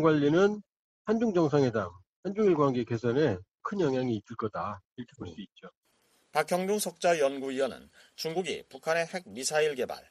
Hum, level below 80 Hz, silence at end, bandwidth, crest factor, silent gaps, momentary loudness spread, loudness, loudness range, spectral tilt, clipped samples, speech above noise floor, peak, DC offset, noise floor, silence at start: none; -66 dBFS; 0.1 s; 14 kHz; 18 dB; 0.79-1.05 s, 2.07-2.23 s, 3.51-3.58 s, 4.85-4.96 s, 5.77-5.82 s; 17 LU; -29 LUFS; 6 LU; -5.5 dB/octave; under 0.1%; 41 dB; -12 dBFS; under 0.1%; -70 dBFS; 0 s